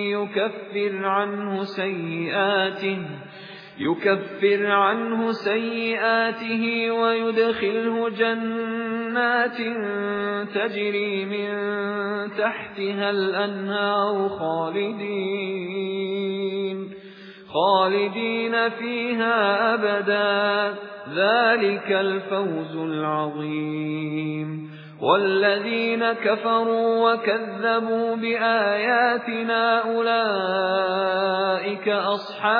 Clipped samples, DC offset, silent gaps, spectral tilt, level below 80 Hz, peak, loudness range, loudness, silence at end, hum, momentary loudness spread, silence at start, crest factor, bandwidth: under 0.1%; under 0.1%; none; -7.5 dB/octave; -76 dBFS; -6 dBFS; 4 LU; -23 LUFS; 0 s; none; 8 LU; 0 s; 18 dB; 5.2 kHz